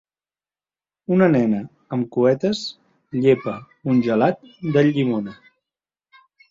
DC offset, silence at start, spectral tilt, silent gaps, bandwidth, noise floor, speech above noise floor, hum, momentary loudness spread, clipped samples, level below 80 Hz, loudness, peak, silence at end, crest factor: under 0.1%; 1.1 s; -7.5 dB/octave; none; 7.6 kHz; under -90 dBFS; over 71 dB; 50 Hz at -50 dBFS; 13 LU; under 0.1%; -62 dBFS; -20 LUFS; -4 dBFS; 1.2 s; 18 dB